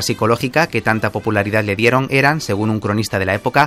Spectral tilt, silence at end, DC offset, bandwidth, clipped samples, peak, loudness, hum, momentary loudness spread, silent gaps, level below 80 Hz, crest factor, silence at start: -5.5 dB/octave; 0 s; under 0.1%; 15.5 kHz; under 0.1%; 0 dBFS; -16 LUFS; none; 5 LU; none; -48 dBFS; 16 dB; 0 s